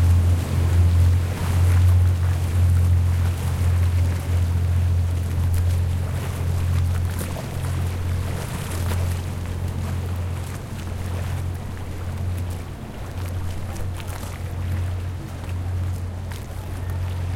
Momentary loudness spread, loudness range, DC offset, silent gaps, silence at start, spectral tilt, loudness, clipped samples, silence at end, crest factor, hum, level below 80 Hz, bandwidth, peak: 12 LU; 10 LU; under 0.1%; none; 0 s; -6.5 dB/octave; -24 LUFS; under 0.1%; 0 s; 14 dB; none; -36 dBFS; 15.5 kHz; -8 dBFS